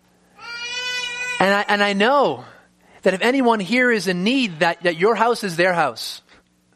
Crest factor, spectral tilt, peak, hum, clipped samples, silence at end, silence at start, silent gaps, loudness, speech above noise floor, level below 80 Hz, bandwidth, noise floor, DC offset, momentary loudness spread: 20 dB; -4.5 dB/octave; 0 dBFS; none; under 0.1%; 0.55 s; 0.4 s; none; -19 LUFS; 36 dB; -66 dBFS; 15 kHz; -55 dBFS; under 0.1%; 13 LU